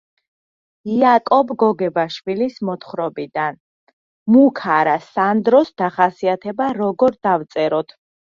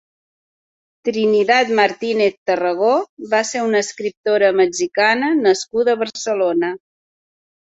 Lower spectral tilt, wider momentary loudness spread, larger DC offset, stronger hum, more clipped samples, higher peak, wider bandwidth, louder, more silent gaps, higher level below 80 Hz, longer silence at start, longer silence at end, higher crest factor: first, -7.5 dB/octave vs -3.5 dB/octave; first, 11 LU vs 7 LU; neither; neither; neither; about the same, -2 dBFS vs -2 dBFS; second, 7.2 kHz vs 8.2 kHz; about the same, -17 LUFS vs -17 LUFS; first, 3.60-3.87 s, 3.93-4.26 s vs 2.37-2.46 s, 3.09-3.17 s, 4.17-4.23 s; about the same, -64 dBFS vs -66 dBFS; second, 0.85 s vs 1.05 s; second, 0.45 s vs 0.95 s; about the same, 16 dB vs 16 dB